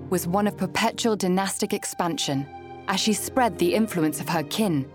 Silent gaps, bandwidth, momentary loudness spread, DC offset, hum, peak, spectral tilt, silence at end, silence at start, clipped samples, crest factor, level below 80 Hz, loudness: none; 18.5 kHz; 5 LU; under 0.1%; none; -10 dBFS; -4.5 dB/octave; 0 s; 0 s; under 0.1%; 16 dB; -62 dBFS; -24 LUFS